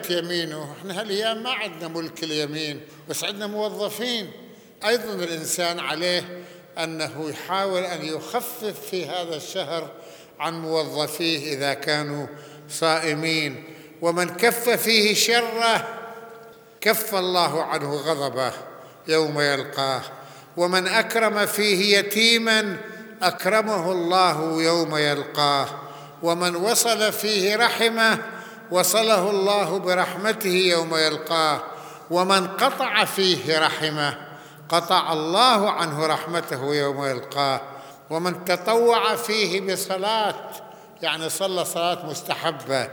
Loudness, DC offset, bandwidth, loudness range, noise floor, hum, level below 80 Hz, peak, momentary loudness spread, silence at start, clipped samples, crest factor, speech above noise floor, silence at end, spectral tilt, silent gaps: -22 LUFS; under 0.1%; over 20 kHz; 7 LU; -45 dBFS; none; -76 dBFS; -2 dBFS; 13 LU; 0 s; under 0.1%; 22 dB; 23 dB; 0 s; -3 dB/octave; none